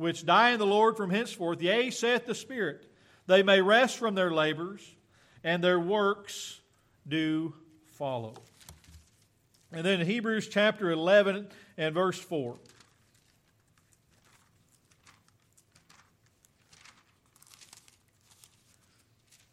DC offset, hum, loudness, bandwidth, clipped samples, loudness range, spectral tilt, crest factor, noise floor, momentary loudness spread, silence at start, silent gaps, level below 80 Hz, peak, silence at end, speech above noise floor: under 0.1%; none; -28 LUFS; 15 kHz; under 0.1%; 10 LU; -4.5 dB/octave; 20 dB; -68 dBFS; 17 LU; 0 s; none; -74 dBFS; -10 dBFS; 6.95 s; 40 dB